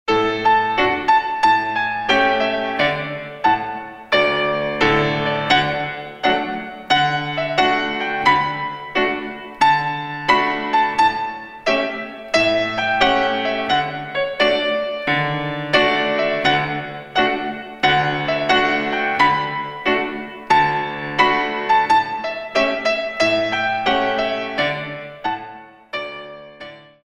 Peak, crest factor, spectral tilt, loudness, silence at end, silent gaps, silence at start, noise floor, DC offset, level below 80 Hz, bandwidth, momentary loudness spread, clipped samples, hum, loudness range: 0 dBFS; 18 dB; -4.5 dB/octave; -18 LUFS; 0.25 s; none; 0.05 s; -39 dBFS; under 0.1%; -48 dBFS; 10.5 kHz; 11 LU; under 0.1%; none; 1 LU